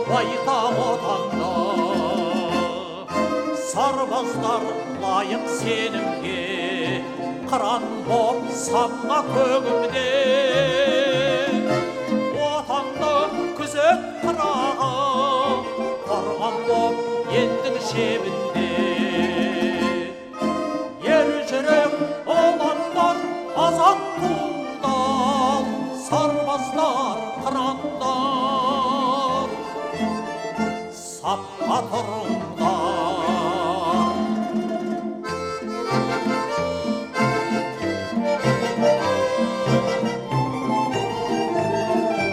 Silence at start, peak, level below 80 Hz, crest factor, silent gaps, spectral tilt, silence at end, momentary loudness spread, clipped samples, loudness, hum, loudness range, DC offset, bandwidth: 0 s; -4 dBFS; -56 dBFS; 18 dB; none; -5 dB/octave; 0 s; 7 LU; under 0.1%; -22 LUFS; none; 4 LU; under 0.1%; 14.5 kHz